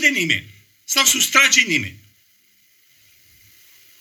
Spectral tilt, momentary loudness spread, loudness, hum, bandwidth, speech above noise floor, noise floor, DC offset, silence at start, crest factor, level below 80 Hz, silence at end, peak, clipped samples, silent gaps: -0.5 dB/octave; 10 LU; -15 LUFS; none; over 20 kHz; 40 dB; -58 dBFS; under 0.1%; 0 s; 20 dB; -62 dBFS; 2.05 s; 0 dBFS; under 0.1%; none